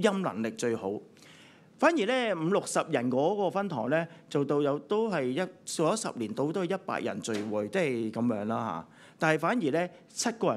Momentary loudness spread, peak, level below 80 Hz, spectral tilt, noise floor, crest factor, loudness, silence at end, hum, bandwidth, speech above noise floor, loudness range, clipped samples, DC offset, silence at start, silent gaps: 6 LU; -10 dBFS; -80 dBFS; -5 dB/octave; -55 dBFS; 20 dB; -30 LUFS; 0 s; none; 14 kHz; 26 dB; 2 LU; under 0.1%; under 0.1%; 0 s; none